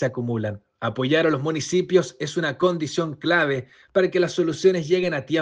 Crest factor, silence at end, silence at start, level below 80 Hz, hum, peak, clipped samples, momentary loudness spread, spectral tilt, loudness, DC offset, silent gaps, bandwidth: 18 dB; 0 s; 0 s; -64 dBFS; none; -4 dBFS; under 0.1%; 8 LU; -5.5 dB/octave; -22 LUFS; under 0.1%; none; 9.4 kHz